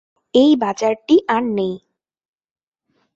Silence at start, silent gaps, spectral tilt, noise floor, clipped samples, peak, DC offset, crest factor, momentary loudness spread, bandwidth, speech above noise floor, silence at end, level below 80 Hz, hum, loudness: 0.35 s; none; -5.5 dB/octave; -68 dBFS; under 0.1%; -2 dBFS; under 0.1%; 16 dB; 10 LU; 7.8 kHz; 52 dB; 1.4 s; -62 dBFS; none; -17 LUFS